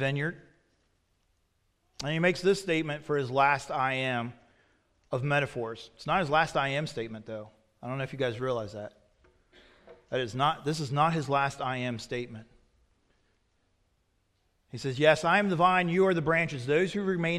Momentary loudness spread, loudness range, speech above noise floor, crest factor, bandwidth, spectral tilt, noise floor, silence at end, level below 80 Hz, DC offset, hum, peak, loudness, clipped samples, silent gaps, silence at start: 15 LU; 9 LU; 45 dB; 22 dB; 13 kHz; -5.5 dB/octave; -73 dBFS; 0 s; -62 dBFS; under 0.1%; none; -8 dBFS; -28 LUFS; under 0.1%; none; 0 s